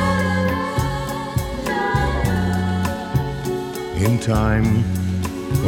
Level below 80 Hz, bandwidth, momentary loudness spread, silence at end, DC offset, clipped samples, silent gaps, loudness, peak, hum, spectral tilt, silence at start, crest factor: -32 dBFS; 19 kHz; 7 LU; 0 s; under 0.1%; under 0.1%; none; -21 LUFS; -6 dBFS; none; -6.5 dB/octave; 0 s; 14 dB